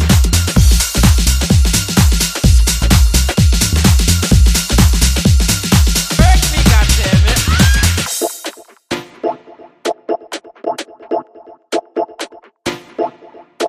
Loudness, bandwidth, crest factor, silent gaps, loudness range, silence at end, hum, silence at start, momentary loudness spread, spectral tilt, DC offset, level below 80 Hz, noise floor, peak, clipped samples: -13 LUFS; 15.5 kHz; 12 dB; none; 12 LU; 0 s; none; 0 s; 13 LU; -4 dB/octave; under 0.1%; -16 dBFS; -40 dBFS; 0 dBFS; under 0.1%